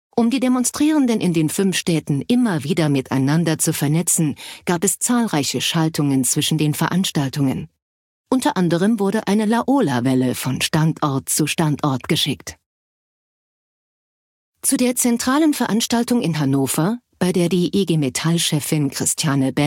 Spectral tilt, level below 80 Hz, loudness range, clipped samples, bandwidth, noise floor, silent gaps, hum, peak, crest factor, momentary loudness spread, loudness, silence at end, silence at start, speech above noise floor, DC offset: -4.5 dB/octave; -56 dBFS; 4 LU; under 0.1%; 17 kHz; under -90 dBFS; 7.82-8.24 s, 12.66-14.53 s; none; -2 dBFS; 16 dB; 4 LU; -19 LUFS; 0 s; 0.15 s; over 72 dB; under 0.1%